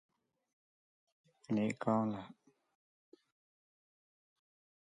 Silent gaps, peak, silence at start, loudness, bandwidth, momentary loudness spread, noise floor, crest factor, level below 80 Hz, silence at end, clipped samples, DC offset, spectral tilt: none; -18 dBFS; 1.5 s; -37 LUFS; 9.6 kHz; 13 LU; under -90 dBFS; 24 dB; -80 dBFS; 2.55 s; under 0.1%; under 0.1%; -7.5 dB/octave